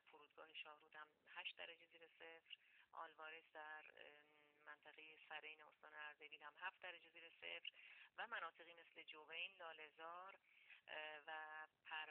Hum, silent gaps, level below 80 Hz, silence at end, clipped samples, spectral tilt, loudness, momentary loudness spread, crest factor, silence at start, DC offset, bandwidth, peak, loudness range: none; none; under -90 dBFS; 0 s; under 0.1%; 3 dB/octave; -57 LUFS; 11 LU; 22 dB; 0.05 s; under 0.1%; 4.2 kHz; -36 dBFS; 5 LU